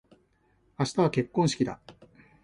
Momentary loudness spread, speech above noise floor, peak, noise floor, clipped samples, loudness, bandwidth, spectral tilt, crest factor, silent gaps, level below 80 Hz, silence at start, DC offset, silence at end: 7 LU; 41 dB; -10 dBFS; -67 dBFS; under 0.1%; -28 LUFS; 11.5 kHz; -6 dB/octave; 20 dB; none; -62 dBFS; 0.8 s; under 0.1%; 0.5 s